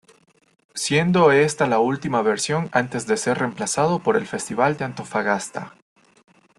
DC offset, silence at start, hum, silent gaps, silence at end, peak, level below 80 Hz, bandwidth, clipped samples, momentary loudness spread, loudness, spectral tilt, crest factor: under 0.1%; 0.75 s; none; none; 0.9 s; -4 dBFS; -60 dBFS; 12.5 kHz; under 0.1%; 11 LU; -21 LUFS; -4.5 dB/octave; 18 dB